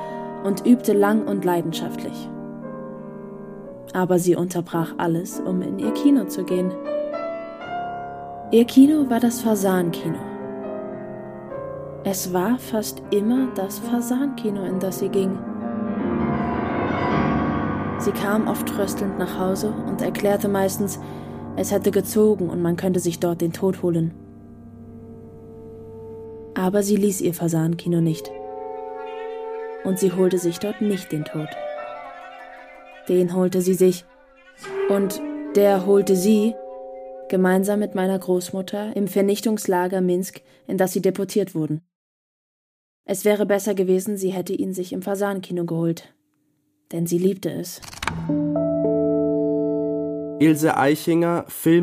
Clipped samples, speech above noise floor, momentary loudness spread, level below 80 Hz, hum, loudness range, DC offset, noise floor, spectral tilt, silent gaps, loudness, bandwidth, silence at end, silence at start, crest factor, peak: under 0.1%; 47 dB; 16 LU; -52 dBFS; none; 6 LU; under 0.1%; -68 dBFS; -6 dB/octave; 41.95-43.04 s; -22 LUFS; 15.5 kHz; 0 s; 0 s; 20 dB; -2 dBFS